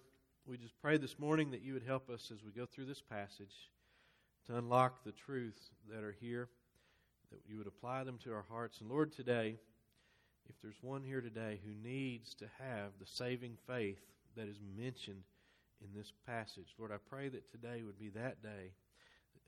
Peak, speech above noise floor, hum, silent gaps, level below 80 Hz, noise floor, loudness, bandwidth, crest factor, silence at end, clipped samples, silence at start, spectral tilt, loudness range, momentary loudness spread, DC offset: -18 dBFS; 32 dB; none; none; -80 dBFS; -76 dBFS; -44 LUFS; 13.5 kHz; 26 dB; 0.1 s; under 0.1%; 0.45 s; -6.5 dB/octave; 8 LU; 19 LU; under 0.1%